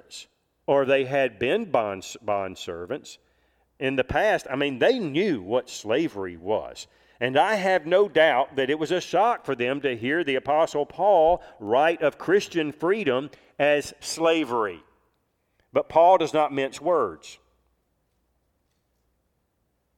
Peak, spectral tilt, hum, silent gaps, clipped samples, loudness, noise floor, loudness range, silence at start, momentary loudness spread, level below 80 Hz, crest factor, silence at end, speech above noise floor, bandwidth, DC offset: -6 dBFS; -4.5 dB/octave; none; none; under 0.1%; -24 LUFS; -73 dBFS; 4 LU; 0.1 s; 12 LU; -58 dBFS; 20 dB; 2.65 s; 49 dB; 15 kHz; under 0.1%